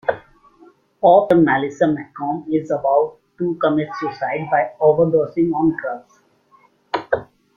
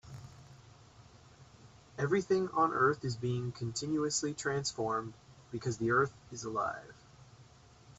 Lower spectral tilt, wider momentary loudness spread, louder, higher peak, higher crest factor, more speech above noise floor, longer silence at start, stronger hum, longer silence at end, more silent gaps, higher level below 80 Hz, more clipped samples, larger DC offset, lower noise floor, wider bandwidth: first, -8 dB/octave vs -4.5 dB/octave; second, 12 LU vs 18 LU; first, -19 LUFS vs -34 LUFS; first, -2 dBFS vs -16 dBFS; about the same, 18 dB vs 20 dB; first, 38 dB vs 25 dB; about the same, 0.05 s vs 0.05 s; neither; first, 0.3 s vs 0.1 s; neither; first, -58 dBFS vs -66 dBFS; neither; neither; second, -55 dBFS vs -59 dBFS; second, 7.2 kHz vs 8.4 kHz